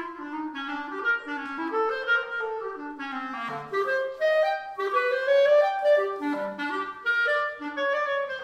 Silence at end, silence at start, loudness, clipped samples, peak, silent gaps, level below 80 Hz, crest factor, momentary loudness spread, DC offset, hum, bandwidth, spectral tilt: 0 s; 0 s; -26 LUFS; under 0.1%; -12 dBFS; none; -72 dBFS; 14 dB; 12 LU; under 0.1%; none; 9.2 kHz; -4 dB/octave